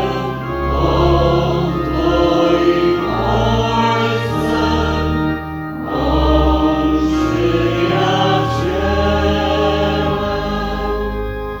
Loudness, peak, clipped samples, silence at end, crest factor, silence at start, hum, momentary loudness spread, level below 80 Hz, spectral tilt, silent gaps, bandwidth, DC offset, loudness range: -16 LUFS; -2 dBFS; under 0.1%; 0 s; 14 dB; 0 s; none; 7 LU; -24 dBFS; -7 dB/octave; none; 18.5 kHz; under 0.1%; 2 LU